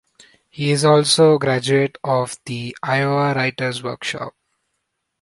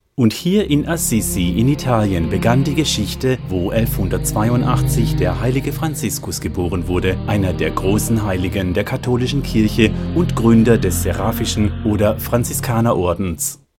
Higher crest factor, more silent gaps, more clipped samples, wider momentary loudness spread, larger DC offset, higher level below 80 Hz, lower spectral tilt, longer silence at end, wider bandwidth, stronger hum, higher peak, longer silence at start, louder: about the same, 18 dB vs 16 dB; neither; neither; first, 13 LU vs 5 LU; neither; second, -62 dBFS vs -30 dBFS; about the same, -4.5 dB/octave vs -5.5 dB/octave; first, 0.9 s vs 0.25 s; second, 11.5 kHz vs 17 kHz; neither; about the same, -2 dBFS vs 0 dBFS; first, 0.55 s vs 0.2 s; about the same, -18 LUFS vs -17 LUFS